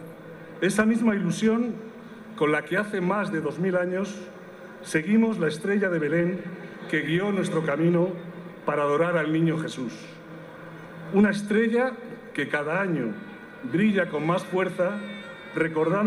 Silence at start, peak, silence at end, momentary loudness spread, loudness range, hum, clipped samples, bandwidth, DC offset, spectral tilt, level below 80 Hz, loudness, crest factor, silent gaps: 0 s; -8 dBFS; 0 s; 19 LU; 2 LU; none; under 0.1%; 12.5 kHz; under 0.1%; -6.5 dB/octave; -66 dBFS; -25 LUFS; 16 dB; none